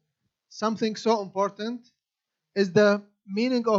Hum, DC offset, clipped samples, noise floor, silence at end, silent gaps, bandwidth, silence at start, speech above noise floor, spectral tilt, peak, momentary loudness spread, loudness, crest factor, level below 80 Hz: none; under 0.1%; under 0.1%; -86 dBFS; 0 s; none; 7.6 kHz; 0.55 s; 62 dB; -5.5 dB/octave; -6 dBFS; 14 LU; -26 LUFS; 20 dB; -78 dBFS